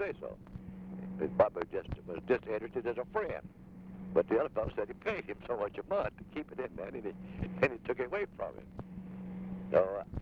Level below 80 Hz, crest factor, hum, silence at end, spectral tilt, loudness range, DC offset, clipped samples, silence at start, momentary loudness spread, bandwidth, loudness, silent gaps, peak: -56 dBFS; 22 dB; none; 0 s; -8.5 dB/octave; 3 LU; under 0.1%; under 0.1%; 0 s; 16 LU; 7.2 kHz; -36 LUFS; none; -14 dBFS